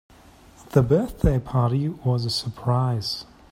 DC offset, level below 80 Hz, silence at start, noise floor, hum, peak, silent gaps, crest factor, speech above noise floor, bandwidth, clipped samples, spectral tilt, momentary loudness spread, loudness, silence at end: under 0.1%; -36 dBFS; 0.7 s; -50 dBFS; none; -4 dBFS; none; 20 dB; 28 dB; 14.5 kHz; under 0.1%; -7 dB/octave; 6 LU; -23 LUFS; 0.3 s